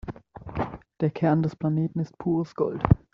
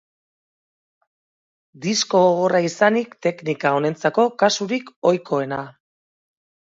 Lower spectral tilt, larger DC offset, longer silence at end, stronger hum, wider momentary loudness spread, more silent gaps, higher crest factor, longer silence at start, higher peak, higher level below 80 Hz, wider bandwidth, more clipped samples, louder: first, -9 dB/octave vs -4.5 dB/octave; neither; second, 0.15 s vs 0.95 s; neither; first, 12 LU vs 9 LU; second, none vs 4.96-5.02 s; about the same, 22 dB vs 18 dB; second, 0.05 s vs 1.8 s; about the same, -4 dBFS vs -2 dBFS; first, -44 dBFS vs -70 dBFS; second, 6.4 kHz vs 7.8 kHz; neither; second, -27 LUFS vs -20 LUFS